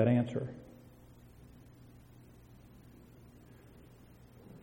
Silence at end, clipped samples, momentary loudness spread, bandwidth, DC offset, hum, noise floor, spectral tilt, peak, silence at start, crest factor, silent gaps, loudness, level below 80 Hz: 0.05 s; under 0.1%; 21 LU; 16.5 kHz; under 0.1%; 60 Hz at -65 dBFS; -57 dBFS; -9 dB/octave; -14 dBFS; 0 s; 24 dB; none; -35 LUFS; -64 dBFS